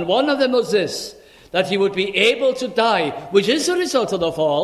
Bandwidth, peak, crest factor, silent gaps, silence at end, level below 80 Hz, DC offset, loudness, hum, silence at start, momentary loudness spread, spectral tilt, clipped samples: 14 kHz; -2 dBFS; 18 dB; none; 0 s; -56 dBFS; under 0.1%; -18 LUFS; none; 0 s; 6 LU; -3.5 dB/octave; under 0.1%